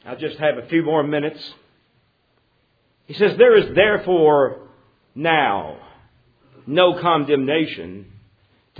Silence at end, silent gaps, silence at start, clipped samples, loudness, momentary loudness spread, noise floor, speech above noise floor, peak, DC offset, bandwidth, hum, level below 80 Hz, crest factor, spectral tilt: 0.75 s; none; 0.05 s; under 0.1%; -18 LUFS; 22 LU; -64 dBFS; 46 dB; 0 dBFS; under 0.1%; 5 kHz; none; -58 dBFS; 20 dB; -8.5 dB/octave